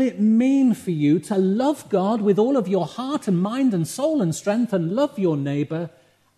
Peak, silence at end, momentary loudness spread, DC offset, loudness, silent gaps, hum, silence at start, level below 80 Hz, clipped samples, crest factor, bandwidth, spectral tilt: -8 dBFS; 0.5 s; 7 LU; under 0.1%; -21 LUFS; none; none; 0 s; -70 dBFS; under 0.1%; 14 dB; 13 kHz; -7 dB/octave